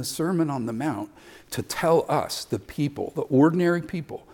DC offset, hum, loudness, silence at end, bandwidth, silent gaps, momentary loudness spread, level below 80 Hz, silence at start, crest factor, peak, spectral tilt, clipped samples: under 0.1%; none; -25 LUFS; 0.15 s; 18 kHz; none; 14 LU; -58 dBFS; 0 s; 16 dB; -8 dBFS; -6 dB/octave; under 0.1%